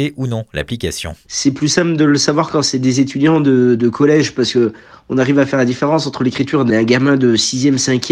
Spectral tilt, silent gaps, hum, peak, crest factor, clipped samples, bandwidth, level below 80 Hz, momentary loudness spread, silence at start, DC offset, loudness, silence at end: -5 dB/octave; none; none; 0 dBFS; 14 dB; under 0.1%; 13 kHz; -46 dBFS; 9 LU; 0 s; under 0.1%; -14 LUFS; 0 s